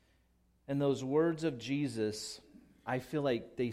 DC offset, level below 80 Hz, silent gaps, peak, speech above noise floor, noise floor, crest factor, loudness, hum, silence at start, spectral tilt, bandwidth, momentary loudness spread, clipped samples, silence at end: under 0.1%; -70 dBFS; none; -20 dBFS; 37 dB; -71 dBFS; 16 dB; -35 LUFS; none; 0.7 s; -6 dB/octave; 15.5 kHz; 11 LU; under 0.1%; 0 s